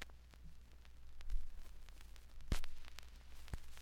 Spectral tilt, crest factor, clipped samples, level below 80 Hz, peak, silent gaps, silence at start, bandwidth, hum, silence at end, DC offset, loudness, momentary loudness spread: -4.5 dB/octave; 20 dB; under 0.1%; -48 dBFS; -22 dBFS; none; 0 s; 14 kHz; none; 0 s; under 0.1%; -54 LUFS; 16 LU